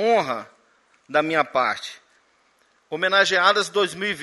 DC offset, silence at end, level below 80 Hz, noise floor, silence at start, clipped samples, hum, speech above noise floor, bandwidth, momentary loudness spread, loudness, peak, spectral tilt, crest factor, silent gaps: under 0.1%; 0 s; -72 dBFS; -62 dBFS; 0 s; under 0.1%; none; 41 dB; 11.5 kHz; 14 LU; -21 LUFS; -2 dBFS; -2.5 dB/octave; 20 dB; none